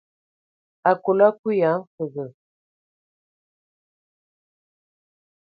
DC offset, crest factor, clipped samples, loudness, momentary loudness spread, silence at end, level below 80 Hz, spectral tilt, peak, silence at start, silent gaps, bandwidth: under 0.1%; 24 dB; under 0.1%; -21 LUFS; 14 LU; 3.1 s; -78 dBFS; -10.5 dB/octave; -2 dBFS; 0.85 s; 1.39-1.43 s, 1.87-1.98 s; 4.9 kHz